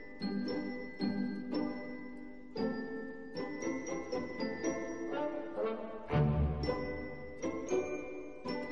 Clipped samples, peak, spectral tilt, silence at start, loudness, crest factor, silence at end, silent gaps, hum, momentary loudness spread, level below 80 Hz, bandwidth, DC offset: under 0.1%; -20 dBFS; -6.5 dB/octave; 0 s; -38 LUFS; 18 dB; 0 s; none; none; 10 LU; -50 dBFS; 7.6 kHz; 0.3%